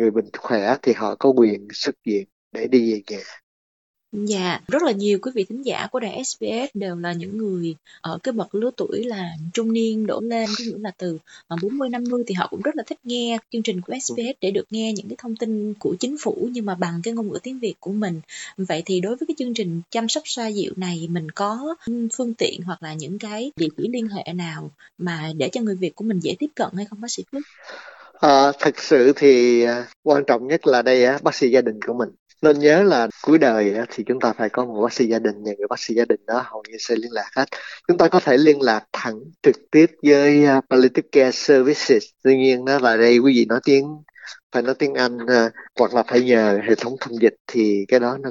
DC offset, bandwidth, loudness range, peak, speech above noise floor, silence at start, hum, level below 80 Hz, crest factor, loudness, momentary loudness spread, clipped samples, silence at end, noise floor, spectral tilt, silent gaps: under 0.1%; 8 kHz; 10 LU; -2 dBFS; over 70 dB; 0 s; none; -70 dBFS; 18 dB; -20 LUFS; 14 LU; under 0.1%; 0 s; under -90 dBFS; -5 dB/octave; 2.32-2.51 s, 3.43-3.94 s, 29.96-30.03 s, 32.19-32.26 s, 44.43-44.50 s, 47.40-47.45 s